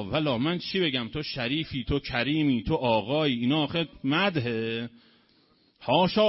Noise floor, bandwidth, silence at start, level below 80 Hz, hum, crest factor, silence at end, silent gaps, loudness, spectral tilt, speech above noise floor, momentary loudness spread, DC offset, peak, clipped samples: -64 dBFS; 5.8 kHz; 0 s; -48 dBFS; none; 18 dB; 0 s; none; -27 LUFS; -9 dB/octave; 37 dB; 6 LU; under 0.1%; -10 dBFS; under 0.1%